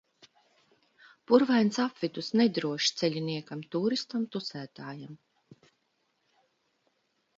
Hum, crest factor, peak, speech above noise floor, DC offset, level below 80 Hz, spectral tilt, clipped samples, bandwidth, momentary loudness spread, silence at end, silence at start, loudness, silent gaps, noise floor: none; 22 dB; -8 dBFS; 47 dB; under 0.1%; -78 dBFS; -5 dB/octave; under 0.1%; 7.8 kHz; 17 LU; 2.2 s; 1.3 s; -29 LUFS; none; -76 dBFS